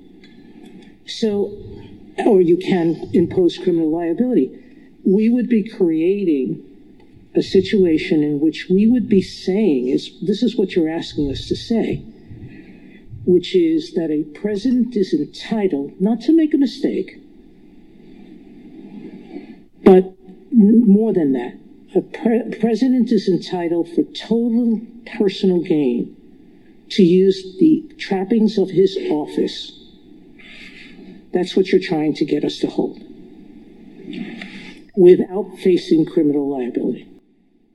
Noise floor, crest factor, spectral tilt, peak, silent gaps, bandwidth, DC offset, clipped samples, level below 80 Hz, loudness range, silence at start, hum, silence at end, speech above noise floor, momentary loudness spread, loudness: -57 dBFS; 18 dB; -7.5 dB/octave; 0 dBFS; none; 11.5 kHz; 0.3%; under 0.1%; -50 dBFS; 5 LU; 0.75 s; none; 0.7 s; 40 dB; 17 LU; -18 LUFS